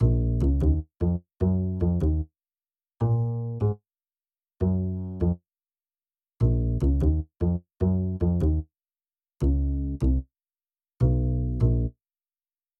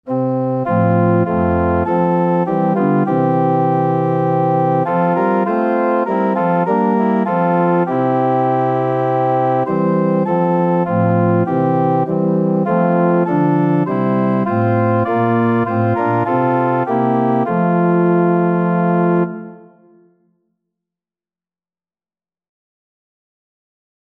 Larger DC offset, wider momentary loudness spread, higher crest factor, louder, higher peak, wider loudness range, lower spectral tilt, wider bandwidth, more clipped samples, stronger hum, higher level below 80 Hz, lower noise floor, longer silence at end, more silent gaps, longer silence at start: neither; first, 6 LU vs 2 LU; about the same, 14 dB vs 12 dB; second, -26 LUFS vs -15 LUFS; second, -10 dBFS vs -2 dBFS; about the same, 3 LU vs 1 LU; about the same, -11.5 dB/octave vs -11 dB/octave; second, 3.1 kHz vs 4.1 kHz; neither; neither; first, -30 dBFS vs -50 dBFS; about the same, under -90 dBFS vs under -90 dBFS; second, 0.9 s vs 4.55 s; neither; about the same, 0 s vs 0.05 s